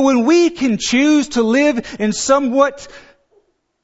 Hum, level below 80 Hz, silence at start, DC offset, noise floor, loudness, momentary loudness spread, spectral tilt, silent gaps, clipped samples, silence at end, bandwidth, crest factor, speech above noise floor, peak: none; -50 dBFS; 0 s; under 0.1%; -59 dBFS; -15 LUFS; 7 LU; -4 dB/octave; none; under 0.1%; 0.85 s; 8 kHz; 16 dB; 44 dB; 0 dBFS